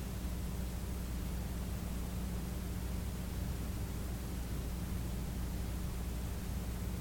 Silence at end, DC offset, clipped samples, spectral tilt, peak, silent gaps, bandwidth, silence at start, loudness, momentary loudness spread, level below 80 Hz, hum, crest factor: 0 s; under 0.1%; under 0.1%; -5.5 dB/octave; -28 dBFS; none; 17.5 kHz; 0 s; -41 LUFS; 1 LU; -42 dBFS; none; 12 dB